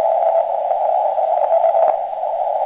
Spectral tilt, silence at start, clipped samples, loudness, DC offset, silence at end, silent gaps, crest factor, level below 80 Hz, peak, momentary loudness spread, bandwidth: -6 dB/octave; 0 s; under 0.1%; -17 LUFS; under 0.1%; 0 s; none; 14 dB; -66 dBFS; -4 dBFS; 6 LU; 4 kHz